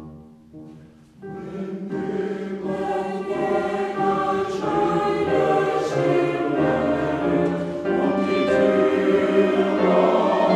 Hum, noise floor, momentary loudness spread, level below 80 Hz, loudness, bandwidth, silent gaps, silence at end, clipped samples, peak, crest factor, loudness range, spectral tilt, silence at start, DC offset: none; -46 dBFS; 10 LU; -54 dBFS; -21 LUFS; 10 kHz; none; 0 s; under 0.1%; -6 dBFS; 16 dB; 7 LU; -7 dB/octave; 0 s; under 0.1%